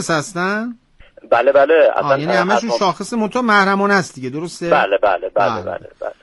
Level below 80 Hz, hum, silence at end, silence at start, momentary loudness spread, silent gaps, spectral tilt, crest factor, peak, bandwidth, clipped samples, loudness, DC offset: -54 dBFS; none; 0.1 s; 0 s; 13 LU; none; -5 dB/octave; 16 dB; 0 dBFS; 11.5 kHz; under 0.1%; -16 LUFS; under 0.1%